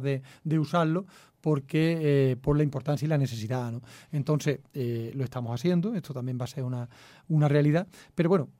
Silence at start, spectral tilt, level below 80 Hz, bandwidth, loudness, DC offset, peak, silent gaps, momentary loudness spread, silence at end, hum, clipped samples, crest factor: 0 s; -8 dB/octave; -56 dBFS; 14.5 kHz; -28 LUFS; under 0.1%; -12 dBFS; none; 10 LU; 0.15 s; none; under 0.1%; 16 dB